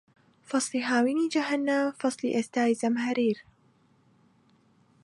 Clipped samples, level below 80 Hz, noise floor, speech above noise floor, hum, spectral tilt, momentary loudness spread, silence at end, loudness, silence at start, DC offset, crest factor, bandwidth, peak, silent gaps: under 0.1%; -78 dBFS; -64 dBFS; 38 dB; none; -4 dB/octave; 4 LU; 1.65 s; -27 LUFS; 0.5 s; under 0.1%; 16 dB; 11.5 kHz; -12 dBFS; none